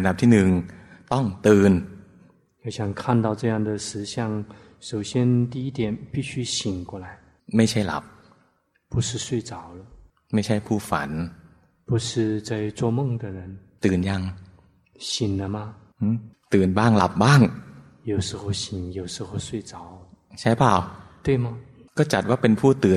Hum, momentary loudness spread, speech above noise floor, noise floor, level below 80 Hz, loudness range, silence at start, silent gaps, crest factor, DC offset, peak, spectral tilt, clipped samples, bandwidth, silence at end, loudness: none; 19 LU; 43 dB; -65 dBFS; -52 dBFS; 6 LU; 0 s; none; 20 dB; under 0.1%; -2 dBFS; -6 dB/octave; under 0.1%; 13.5 kHz; 0 s; -23 LUFS